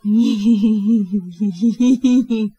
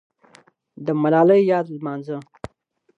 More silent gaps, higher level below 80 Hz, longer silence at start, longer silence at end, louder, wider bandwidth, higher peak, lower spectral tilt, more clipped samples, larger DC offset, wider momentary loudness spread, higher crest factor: neither; about the same, -56 dBFS vs -60 dBFS; second, 0.05 s vs 0.8 s; second, 0.1 s vs 0.75 s; first, -16 LUFS vs -19 LUFS; about the same, 8.2 kHz vs 8 kHz; about the same, -4 dBFS vs -4 dBFS; second, -7 dB/octave vs -9 dB/octave; neither; neither; second, 6 LU vs 25 LU; second, 12 dB vs 18 dB